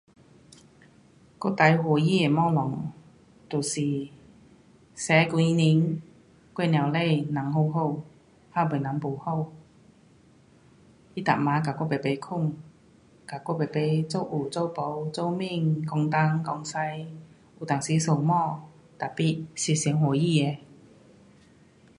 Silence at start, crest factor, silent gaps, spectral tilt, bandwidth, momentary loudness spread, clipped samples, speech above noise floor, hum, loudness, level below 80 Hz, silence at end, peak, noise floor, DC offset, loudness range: 1.4 s; 22 dB; none; -6 dB/octave; 11 kHz; 14 LU; under 0.1%; 32 dB; none; -26 LUFS; -66 dBFS; 1.25 s; -4 dBFS; -57 dBFS; under 0.1%; 5 LU